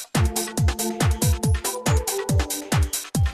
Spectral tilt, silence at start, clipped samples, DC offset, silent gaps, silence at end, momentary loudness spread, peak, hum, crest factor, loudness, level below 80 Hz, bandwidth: -4.5 dB/octave; 0 s; under 0.1%; under 0.1%; none; 0 s; 2 LU; -8 dBFS; none; 14 dB; -23 LUFS; -28 dBFS; 14 kHz